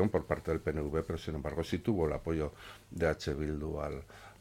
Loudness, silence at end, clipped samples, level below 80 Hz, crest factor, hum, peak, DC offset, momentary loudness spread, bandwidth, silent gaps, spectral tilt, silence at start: -35 LUFS; 0.1 s; under 0.1%; -46 dBFS; 20 dB; none; -14 dBFS; under 0.1%; 9 LU; 16.5 kHz; none; -7 dB/octave; 0 s